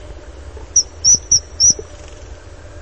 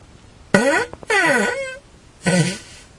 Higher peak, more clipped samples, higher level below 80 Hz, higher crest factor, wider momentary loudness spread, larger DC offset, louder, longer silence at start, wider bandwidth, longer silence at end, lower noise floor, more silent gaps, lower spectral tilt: about the same, -2 dBFS vs 0 dBFS; neither; first, -36 dBFS vs -52 dBFS; about the same, 18 dB vs 20 dB; second, 5 LU vs 14 LU; first, 0.6% vs under 0.1%; first, -12 LUFS vs -18 LUFS; second, 0.05 s vs 0.55 s; second, 8.8 kHz vs 11.5 kHz; second, 0 s vs 0.2 s; second, -36 dBFS vs -45 dBFS; neither; second, 0 dB/octave vs -4.5 dB/octave